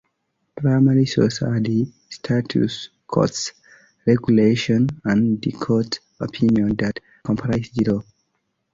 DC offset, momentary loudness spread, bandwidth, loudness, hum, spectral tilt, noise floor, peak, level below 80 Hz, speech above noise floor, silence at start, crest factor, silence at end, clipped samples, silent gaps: under 0.1%; 11 LU; 7.8 kHz; -20 LUFS; none; -6.5 dB/octave; -72 dBFS; -4 dBFS; -50 dBFS; 53 dB; 0.55 s; 18 dB; 0.7 s; under 0.1%; none